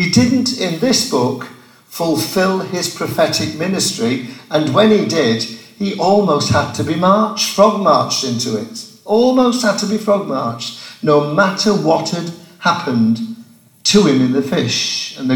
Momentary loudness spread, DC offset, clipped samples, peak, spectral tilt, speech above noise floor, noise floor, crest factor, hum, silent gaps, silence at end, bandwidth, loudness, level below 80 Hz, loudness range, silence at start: 11 LU; under 0.1%; under 0.1%; 0 dBFS; -4.5 dB/octave; 27 dB; -42 dBFS; 16 dB; none; none; 0 s; 19 kHz; -15 LUFS; -52 dBFS; 3 LU; 0 s